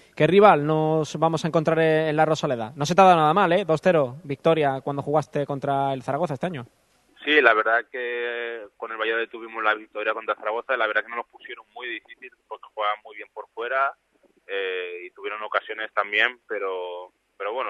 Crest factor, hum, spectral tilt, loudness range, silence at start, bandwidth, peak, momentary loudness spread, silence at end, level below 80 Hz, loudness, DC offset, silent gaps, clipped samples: 22 dB; none; -5.5 dB/octave; 9 LU; 0.15 s; 12 kHz; 0 dBFS; 18 LU; 0 s; -66 dBFS; -23 LUFS; under 0.1%; none; under 0.1%